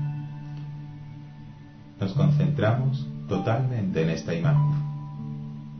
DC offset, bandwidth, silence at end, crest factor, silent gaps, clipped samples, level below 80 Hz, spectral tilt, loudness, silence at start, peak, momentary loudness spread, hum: 0.1%; 6.4 kHz; 0 s; 16 dB; none; under 0.1%; -52 dBFS; -8.5 dB/octave; -26 LUFS; 0 s; -10 dBFS; 20 LU; none